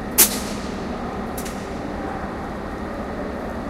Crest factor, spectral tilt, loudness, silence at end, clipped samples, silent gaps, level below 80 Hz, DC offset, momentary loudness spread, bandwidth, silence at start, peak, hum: 26 dB; -3 dB/octave; -24 LUFS; 0 s; under 0.1%; none; -38 dBFS; under 0.1%; 14 LU; 16.5 kHz; 0 s; 0 dBFS; none